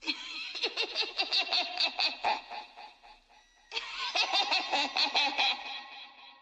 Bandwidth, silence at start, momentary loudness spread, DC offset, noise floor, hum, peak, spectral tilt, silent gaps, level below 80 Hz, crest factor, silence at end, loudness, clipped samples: 9 kHz; 0 s; 17 LU; under 0.1%; -62 dBFS; none; -14 dBFS; 1 dB/octave; none; -74 dBFS; 20 dB; 0.1 s; -29 LUFS; under 0.1%